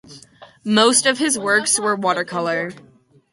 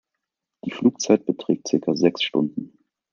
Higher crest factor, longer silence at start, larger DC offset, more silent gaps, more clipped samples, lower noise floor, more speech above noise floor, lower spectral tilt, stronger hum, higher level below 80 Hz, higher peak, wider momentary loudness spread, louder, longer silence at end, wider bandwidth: about the same, 20 dB vs 20 dB; second, 0.1 s vs 0.65 s; neither; neither; neither; second, -45 dBFS vs -83 dBFS; second, 27 dB vs 61 dB; second, -2 dB/octave vs -5 dB/octave; neither; about the same, -66 dBFS vs -70 dBFS; first, 0 dBFS vs -4 dBFS; second, 10 LU vs 14 LU; first, -17 LUFS vs -22 LUFS; about the same, 0.5 s vs 0.45 s; first, 11.5 kHz vs 7.4 kHz